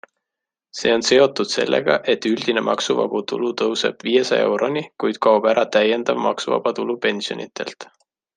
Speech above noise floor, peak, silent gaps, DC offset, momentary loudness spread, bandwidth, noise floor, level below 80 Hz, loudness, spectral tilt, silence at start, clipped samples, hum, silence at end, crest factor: 66 dB; -2 dBFS; none; under 0.1%; 10 LU; 9.6 kHz; -85 dBFS; -66 dBFS; -19 LUFS; -3.5 dB/octave; 0.75 s; under 0.1%; none; 0.5 s; 18 dB